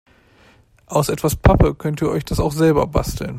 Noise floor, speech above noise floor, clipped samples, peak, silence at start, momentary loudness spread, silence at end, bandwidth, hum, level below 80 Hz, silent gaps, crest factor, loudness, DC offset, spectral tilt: -52 dBFS; 35 dB; under 0.1%; 0 dBFS; 0.9 s; 7 LU; 0 s; 16 kHz; none; -28 dBFS; none; 18 dB; -18 LUFS; under 0.1%; -6.5 dB/octave